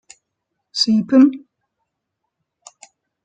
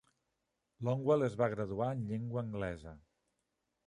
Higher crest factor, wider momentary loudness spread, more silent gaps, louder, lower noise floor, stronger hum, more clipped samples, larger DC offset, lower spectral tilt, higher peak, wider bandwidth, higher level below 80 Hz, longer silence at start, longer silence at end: about the same, 18 dB vs 20 dB; first, 16 LU vs 10 LU; neither; first, -16 LUFS vs -36 LUFS; second, -78 dBFS vs -85 dBFS; neither; neither; neither; second, -4.5 dB/octave vs -8.5 dB/octave; first, -2 dBFS vs -18 dBFS; second, 9 kHz vs 10.5 kHz; about the same, -66 dBFS vs -62 dBFS; about the same, 0.75 s vs 0.8 s; first, 1.85 s vs 0.9 s